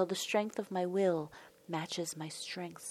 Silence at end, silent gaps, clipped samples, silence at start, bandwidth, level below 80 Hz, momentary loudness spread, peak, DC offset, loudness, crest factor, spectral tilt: 0 s; none; under 0.1%; 0 s; 15.5 kHz; -82 dBFS; 10 LU; -18 dBFS; under 0.1%; -36 LUFS; 18 dB; -4 dB/octave